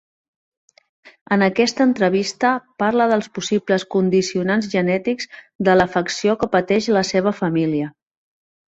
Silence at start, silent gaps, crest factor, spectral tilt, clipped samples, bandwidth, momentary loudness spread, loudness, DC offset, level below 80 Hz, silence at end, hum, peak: 1.3 s; 5.55-5.59 s; 16 dB; -5.5 dB/octave; under 0.1%; 8 kHz; 6 LU; -19 LUFS; under 0.1%; -56 dBFS; 0.85 s; none; -2 dBFS